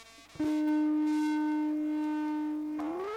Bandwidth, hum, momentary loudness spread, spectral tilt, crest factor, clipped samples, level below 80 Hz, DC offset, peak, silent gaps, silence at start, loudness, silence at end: 9.6 kHz; 50 Hz at -70 dBFS; 7 LU; -5.5 dB/octave; 8 dB; under 0.1%; -70 dBFS; under 0.1%; -22 dBFS; none; 0 s; -31 LUFS; 0 s